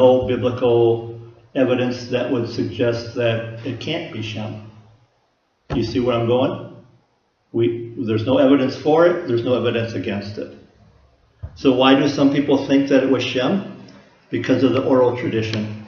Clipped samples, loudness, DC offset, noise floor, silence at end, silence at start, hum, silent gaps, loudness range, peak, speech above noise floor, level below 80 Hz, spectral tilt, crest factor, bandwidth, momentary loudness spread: under 0.1%; -19 LUFS; under 0.1%; -65 dBFS; 0 s; 0 s; none; none; 6 LU; 0 dBFS; 47 dB; -50 dBFS; -7 dB/octave; 20 dB; 6.8 kHz; 14 LU